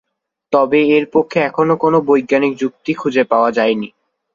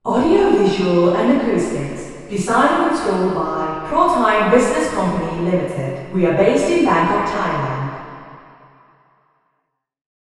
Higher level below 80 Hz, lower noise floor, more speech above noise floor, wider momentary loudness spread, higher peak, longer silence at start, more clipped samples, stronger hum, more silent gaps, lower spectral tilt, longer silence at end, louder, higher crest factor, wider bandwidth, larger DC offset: second, -60 dBFS vs -44 dBFS; second, -46 dBFS vs -72 dBFS; second, 32 dB vs 55 dB; second, 8 LU vs 11 LU; about the same, -2 dBFS vs 0 dBFS; first, 0.5 s vs 0.05 s; neither; neither; neither; about the same, -6.5 dB/octave vs -6 dB/octave; second, 0.45 s vs 1.9 s; about the same, -15 LUFS vs -17 LUFS; about the same, 14 dB vs 18 dB; second, 7.2 kHz vs 12 kHz; neither